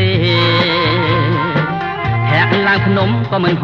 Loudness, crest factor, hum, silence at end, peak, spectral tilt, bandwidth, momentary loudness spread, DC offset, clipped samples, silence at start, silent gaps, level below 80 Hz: -14 LUFS; 14 dB; none; 0 s; 0 dBFS; -7.5 dB/octave; 6.2 kHz; 5 LU; under 0.1%; under 0.1%; 0 s; none; -40 dBFS